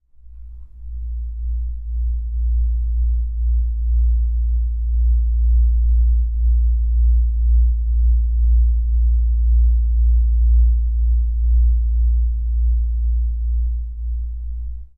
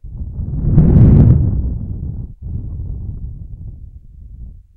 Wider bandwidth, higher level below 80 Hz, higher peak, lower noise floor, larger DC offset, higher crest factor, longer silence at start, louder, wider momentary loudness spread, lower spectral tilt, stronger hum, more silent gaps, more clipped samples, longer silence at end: second, 0.3 kHz vs 2.5 kHz; about the same, -16 dBFS vs -20 dBFS; second, -8 dBFS vs 0 dBFS; about the same, -38 dBFS vs -35 dBFS; neither; second, 8 dB vs 14 dB; first, 0.25 s vs 0.05 s; second, -20 LUFS vs -13 LUFS; second, 10 LU vs 23 LU; about the same, -13 dB/octave vs -13.5 dB/octave; neither; neither; neither; second, 0.1 s vs 0.25 s